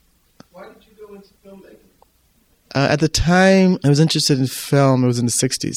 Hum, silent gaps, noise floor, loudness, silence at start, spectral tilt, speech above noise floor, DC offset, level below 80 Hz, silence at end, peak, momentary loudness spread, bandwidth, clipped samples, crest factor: none; none; -59 dBFS; -16 LUFS; 0.55 s; -5 dB/octave; 42 dB; under 0.1%; -38 dBFS; 0 s; -2 dBFS; 6 LU; 15.5 kHz; under 0.1%; 16 dB